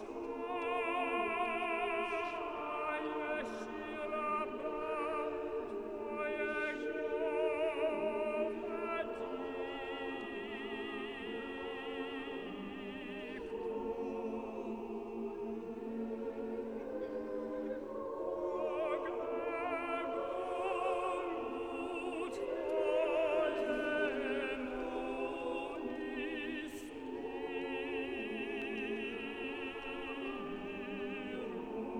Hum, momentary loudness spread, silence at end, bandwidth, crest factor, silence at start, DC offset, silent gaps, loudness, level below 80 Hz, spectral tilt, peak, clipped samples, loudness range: none; 8 LU; 0 s; 19 kHz; 16 dB; 0 s; under 0.1%; none; -39 LUFS; -66 dBFS; -5 dB/octave; -22 dBFS; under 0.1%; 6 LU